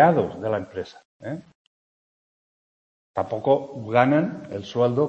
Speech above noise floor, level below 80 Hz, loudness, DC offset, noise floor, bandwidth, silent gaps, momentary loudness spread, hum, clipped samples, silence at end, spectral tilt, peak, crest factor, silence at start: over 68 dB; -64 dBFS; -24 LUFS; under 0.1%; under -90 dBFS; 8.2 kHz; 1.05-1.20 s, 1.55-3.14 s; 16 LU; none; under 0.1%; 0 s; -8 dB/octave; -2 dBFS; 22 dB; 0 s